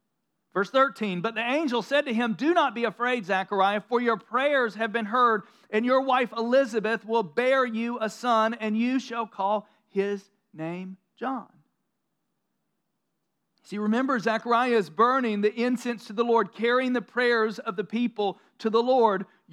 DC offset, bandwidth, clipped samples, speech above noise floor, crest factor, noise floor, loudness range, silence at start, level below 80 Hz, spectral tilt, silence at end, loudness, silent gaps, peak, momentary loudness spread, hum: under 0.1%; 12.5 kHz; under 0.1%; 54 dB; 18 dB; -80 dBFS; 9 LU; 0.55 s; under -90 dBFS; -5.5 dB/octave; 0.3 s; -26 LUFS; none; -8 dBFS; 10 LU; none